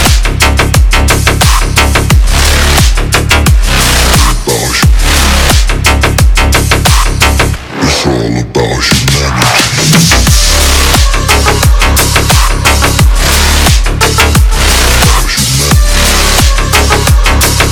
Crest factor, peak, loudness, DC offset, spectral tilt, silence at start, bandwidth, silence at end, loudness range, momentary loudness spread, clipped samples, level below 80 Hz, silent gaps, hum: 6 dB; 0 dBFS; -7 LUFS; under 0.1%; -3.5 dB/octave; 0 s; over 20 kHz; 0 s; 2 LU; 3 LU; 1%; -10 dBFS; none; none